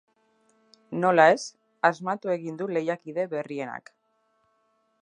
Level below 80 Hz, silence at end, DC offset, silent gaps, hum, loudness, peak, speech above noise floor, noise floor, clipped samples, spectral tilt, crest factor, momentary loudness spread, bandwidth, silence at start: -82 dBFS; 1.25 s; under 0.1%; none; none; -25 LUFS; -4 dBFS; 46 dB; -70 dBFS; under 0.1%; -5.5 dB/octave; 24 dB; 17 LU; 10.5 kHz; 0.9 s